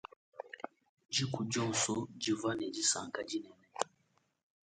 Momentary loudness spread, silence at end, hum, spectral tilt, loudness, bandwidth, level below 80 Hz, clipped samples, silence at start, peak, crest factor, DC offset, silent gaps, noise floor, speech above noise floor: 17 LU; 0.8 s; none; -3 dB/octave; -36 LUFS; 9.4 kHz; -74 dBFS; under 0.1%; 0.35 s; -14 dBFS; 24 dB; under 0.1%; 0.89-0.97 s; -76 dBFS; 40 dB